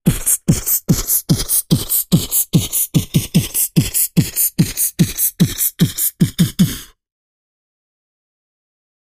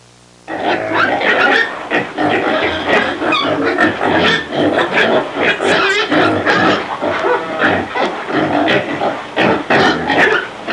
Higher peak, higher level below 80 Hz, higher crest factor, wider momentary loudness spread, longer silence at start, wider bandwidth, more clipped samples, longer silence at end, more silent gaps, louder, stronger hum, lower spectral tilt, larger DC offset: about the same, 0 dBFS vs -2 dBFS; first, -36 dBFS vs -52 dBFS; about the same, 16 dB vs 12 dB; second, 2 LU vs 6 LU; second, 0.05 s vs 0.5 s; first, 15.5 kHz vs 11.5 kHz; neither; first, 2.2 s vs 0 s; neither; about the same, -15 LUFS vs -14 LUFS; neither; about the same, -4.5 dB/octave vs -4.5 dB/octave; second, under 0.1% vs 0.1%